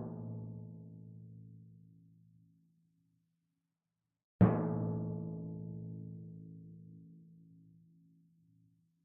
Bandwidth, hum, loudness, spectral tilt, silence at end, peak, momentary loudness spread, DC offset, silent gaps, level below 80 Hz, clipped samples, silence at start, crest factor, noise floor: 2.4 kHz; none; -37 LUFS; -9 dB/octave; 1.35 s; -14 dBFS; 27 LU; under 0.1%; 4.24-4.39 s; -68 dBFS; under 0.1%; 0 s; 28 dB; -89 dBFS